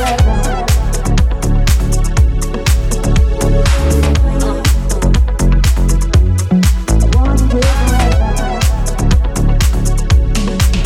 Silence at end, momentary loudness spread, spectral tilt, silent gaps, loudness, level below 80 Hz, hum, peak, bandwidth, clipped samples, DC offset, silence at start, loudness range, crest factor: 0 s; 3 LU; -5.5 dB/octave; none; -14 LUFS; -12 dBFS; none; 0 dBFS; 16 kHz; under 0.1%; under 0.1%; 0 s; 1 LU; 10 dB